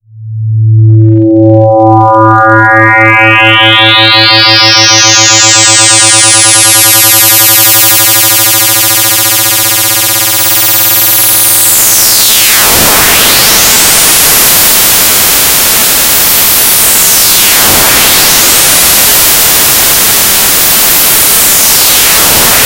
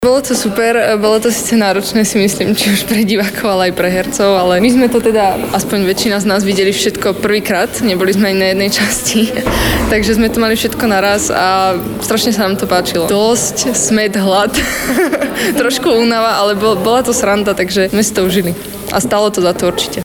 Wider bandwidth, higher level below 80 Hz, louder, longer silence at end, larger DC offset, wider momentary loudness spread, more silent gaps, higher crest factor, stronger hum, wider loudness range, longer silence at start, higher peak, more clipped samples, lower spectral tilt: about the same, over 20 kHz vs over 20 kHz; about the same, -32 dBFS vs -34 dBFS; first, -2 LUFS vs -12 LUFS; about the same, 0 s vs 0 s; second, under 0.1% vs 0.1%; about the same, 3 LU vs 3 LU; neither; second, 4 dB vs 12 dB; neither; about the same, 2 LU vs 1 LU; first, 0.15 s vs 0 s; about the same, 0 dBFS vs 0 dBFS; first, 10% vs under 0.1%; second, -1.5 dB/octave vs -3.5 dB/octave